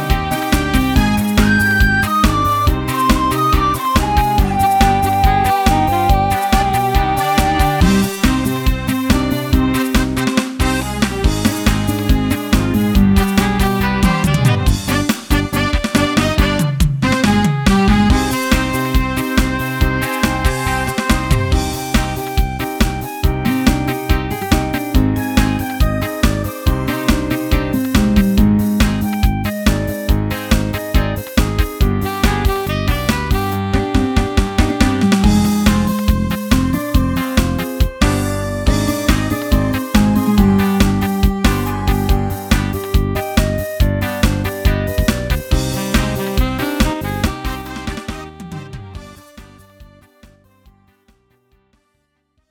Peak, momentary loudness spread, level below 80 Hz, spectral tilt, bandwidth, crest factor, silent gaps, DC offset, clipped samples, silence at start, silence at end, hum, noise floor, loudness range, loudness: 0 dBFS; 5 LU; -20 dBFS; -5.5 dB/octave; 19.5 kHz; 14 dB; none; under 0.1%; under 0.1%; 0 s; 2.65 s; none; -66 dBFS; 4 LU; -16 LUFS